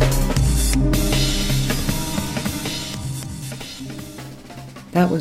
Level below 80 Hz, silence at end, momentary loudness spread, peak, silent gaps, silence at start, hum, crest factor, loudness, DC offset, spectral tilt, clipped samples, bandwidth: -26 dBFS; 0 s; 17 LU; -6 dBFS; none; 0 s; none; 16 dB; -22 LUFS; under 0.1%; -4.5 dB/octave; under 0.1%; 16 kHz